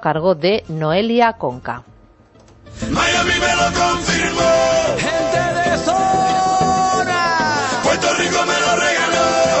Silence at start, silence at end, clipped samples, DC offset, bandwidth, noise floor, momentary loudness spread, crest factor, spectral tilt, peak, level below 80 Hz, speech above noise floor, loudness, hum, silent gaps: 0 s; 0 s; under 0.1%; under 0.1%; 8.4 kHz; -47 dBFS; 4 LU; 14 dB; -3.5 dB/octave; -2 dBFS; -40 dBFS; 31 dB; -16 LUFS; none; none